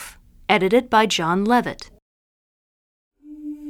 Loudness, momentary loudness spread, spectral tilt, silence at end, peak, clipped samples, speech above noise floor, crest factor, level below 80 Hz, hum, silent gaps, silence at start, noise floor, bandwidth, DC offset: -18 LUFS; 20 LU; -4.5 dB/octave; 0 s; -2 dBFS; under 0.1%; over 71 dB; 22 dB; -52 dBFS; none; 2.02-3.11 s; 0 s; under -90 dBFS; 17 kHz; under 0.1%